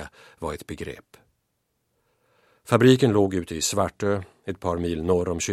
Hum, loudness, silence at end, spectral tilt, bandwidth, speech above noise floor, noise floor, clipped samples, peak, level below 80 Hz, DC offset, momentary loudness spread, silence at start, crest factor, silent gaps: none; -23 LUFS; 0 s; -5 dB/octave; 15 kHz; 52 dB; -75 dBFS; under 0.1%; -2 dBFS; -50 dBFS; under 0.1%; 18 LU; 0 s; 22 dB; none